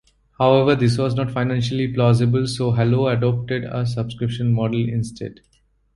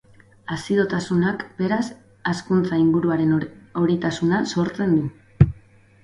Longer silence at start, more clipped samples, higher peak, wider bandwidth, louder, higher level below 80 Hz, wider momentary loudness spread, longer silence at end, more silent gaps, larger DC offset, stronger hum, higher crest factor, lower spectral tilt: about the same, 0.4 s vs 0.5 s; neither; about the same, -2 dBFS vs 0 dBFS; about the same, 11.5 kHz vs 11 kHz; about the same, -20 LUFS vs -22 LUFS; second, -48 dBFS vs -42 dBFS; about the same, 9 LU vs 11 LU; first, 0.65 s vs 0.5 s; neither; neither; neither; about the same, 18 dB vs 22 dB; about the same, -7.5 dB/octave vs -7 dB/octave